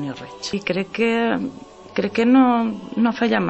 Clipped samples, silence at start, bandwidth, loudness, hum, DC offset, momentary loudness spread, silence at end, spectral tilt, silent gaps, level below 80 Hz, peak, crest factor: under 0.1%; 0 s; 8.4 kHz; -20 LUFS; none; under 0.1%; 14 LU; 0 s; -6 dB/octave; none; -58 dBFS; -4 dBFS; 16 dB